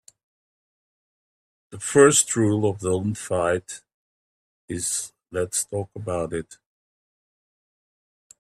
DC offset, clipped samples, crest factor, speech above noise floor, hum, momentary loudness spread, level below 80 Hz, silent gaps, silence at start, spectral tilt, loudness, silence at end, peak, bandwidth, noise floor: under 0.1%; under 0.1%; 24 dB; over 67 dB; none; 17 LU; -60 dBFS; 3.94-4.68 s; 1.7 s; -4 dB/octave; -23 LUFS; 1.85 s; -2 dBFS; 14 kHz; under -90 dBFS